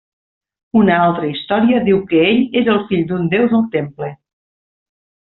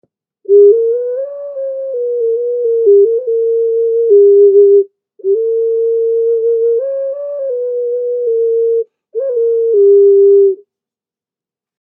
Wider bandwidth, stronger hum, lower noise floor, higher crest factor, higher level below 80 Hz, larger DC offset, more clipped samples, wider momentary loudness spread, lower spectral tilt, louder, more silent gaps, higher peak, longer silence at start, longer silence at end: first, 4.2 kHz vs 1.6 kHz; neither; about the same, under -90 dBFS vs -89 dBFS; about the same, 14 dB vs 12 dB; first, -52 dBFS vs -88 dBFS; neither; neither; second, 8 LU vs 14 LU; second, -5 dB/octave vs -11 dB/octave; second, -15 LUFS vs -11 LUFS; neither; about the same, -2 dBFS vs 0 dBFS; first, 0.75 s vs 0.5 s; second, 1.2 s vs 1.35 s